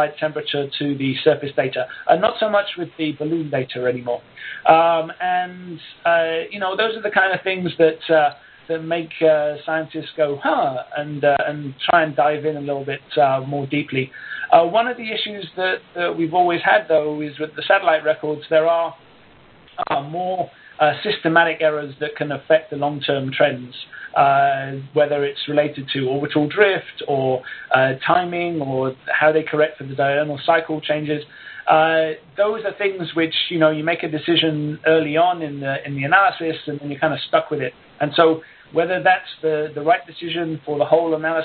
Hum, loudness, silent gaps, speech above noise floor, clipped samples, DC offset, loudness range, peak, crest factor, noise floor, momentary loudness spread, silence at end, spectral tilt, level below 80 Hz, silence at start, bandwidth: none; -20 LUFS; none; 29 dB; under 0.1%; under 0.1%; 2 LU; 0 dBFS; 20 dB; -49 dBFS; 10 LU; 0 s; -9.5 dB/octave; -64 dBFS; 0 s; 4.7 kHz